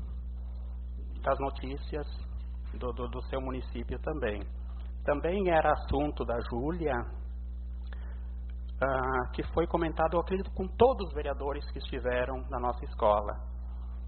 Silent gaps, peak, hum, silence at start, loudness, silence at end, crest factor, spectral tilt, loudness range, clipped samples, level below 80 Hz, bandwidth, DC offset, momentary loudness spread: none; -10 dBFS; 60 Hz at -40 dBFS; 0 s; -33 LUFS; 0 s; 22 dB; -5.5 dB/octave; 6 LU; under 0.1%; -38 dBFS; 4.5 kHz; under 0.1%; 14 LU